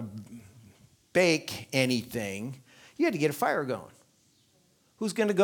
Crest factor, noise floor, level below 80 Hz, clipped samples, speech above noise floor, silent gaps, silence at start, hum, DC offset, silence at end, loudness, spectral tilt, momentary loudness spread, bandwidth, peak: 22 dB; -66 dBFS; -70 dBFS; under 0.1%; 39 dB; none; 0 s; none; under 0.1%; 0 s; -29 LUFS; -4.5 dB/octave; 21 LU; 19.5 kHz; -10 dBFS